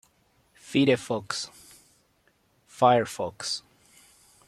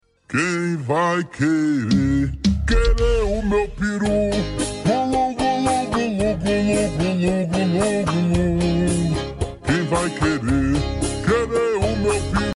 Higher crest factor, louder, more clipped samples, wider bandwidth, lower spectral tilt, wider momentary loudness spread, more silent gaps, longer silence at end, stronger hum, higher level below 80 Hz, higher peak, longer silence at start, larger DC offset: first, 24 dB vs 12 dB; second, -26 LUFS vs -20 LUFS; neither; first, 14 kHz vs 11.5 kHz; second, -4.5 dB/octave vs -6 dB/octave; first, 12 LU vs 3 LU; neither; first, 0.9 s vs 0 s; neither; second, -68 dBFS vs -28 dBFS; about the same, -6 dBFS vs -8 dBFS; first, 0.65 s vs 0.3 s; neither